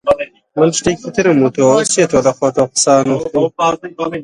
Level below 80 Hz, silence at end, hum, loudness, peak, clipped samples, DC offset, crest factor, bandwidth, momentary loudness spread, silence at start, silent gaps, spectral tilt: -48 dBFS; 0 s; none; -14 LUFS; 0 dBFS; under 0.1%; under 0.1%; 14 dB; 11.5 kHz; 6 LU; 0.05 s; none; -4 dB/octave